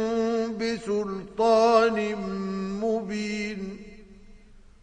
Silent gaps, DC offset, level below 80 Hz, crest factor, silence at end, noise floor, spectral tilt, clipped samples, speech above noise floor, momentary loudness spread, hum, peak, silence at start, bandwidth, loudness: none; under 0.1%; -54 dBFS; 20 dB; 0.25 s; -50 dBFS; -5.5 dB/octave; under 0.1%; 26 dB; 13 LU; none; -6 dBFS; 0 s; 9.8 kHz; -26 LUFS